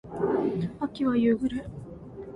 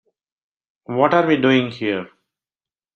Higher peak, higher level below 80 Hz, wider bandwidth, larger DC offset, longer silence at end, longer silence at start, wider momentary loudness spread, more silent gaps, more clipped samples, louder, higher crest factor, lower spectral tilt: second, -14 dBFS vs -2 dBFS; first, -54 dBFS vs -64 dBFS; first, 9.8 kHz vs 6.8 kHz; neither; second, 0 s vs 0.9 s; second, 0.05 s vs 0.9 s; first, 18 LU vs 11 LU; neither; neither; second, -27 LUFS vs -18 LUFS; second, 14 dB vs 20 dB; first, -8.5 dB/octave vs -7 dB/octave